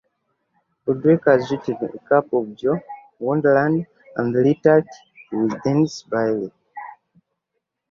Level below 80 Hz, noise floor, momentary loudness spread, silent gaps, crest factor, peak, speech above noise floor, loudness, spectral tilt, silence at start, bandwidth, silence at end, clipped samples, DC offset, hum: -62 dBFS; -78 dBFS; 16 LU; none; 20 dB; -2 dBFS; 59 dB; -20 LUFS; -7.5 dB/octave; 0.85 s; 7.4 kHz; 1 s; under 0.1%; under 0.1%; none